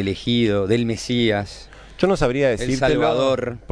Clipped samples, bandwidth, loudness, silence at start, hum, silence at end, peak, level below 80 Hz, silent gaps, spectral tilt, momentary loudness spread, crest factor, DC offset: under 0.1%; 11 kHz; -20 LUFS; 0 s; none; 0.15 s; -2 dBFS; -38 dBFS; none; -5.5 dB/octave; 6 LU; 18 dB; under 0.1%